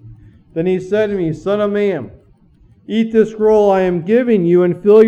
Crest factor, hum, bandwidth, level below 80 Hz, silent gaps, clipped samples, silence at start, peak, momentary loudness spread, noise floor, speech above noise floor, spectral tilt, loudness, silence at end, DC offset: 14 dB; none; 8.2 kHz; -48 dBFS; none; under 0.1%; 0.05 s; 0 dBFS; 9 LU; -49 dBFS; 36 dB; -8 dB/octave; -15 LUFS; 0 s; under 0.1%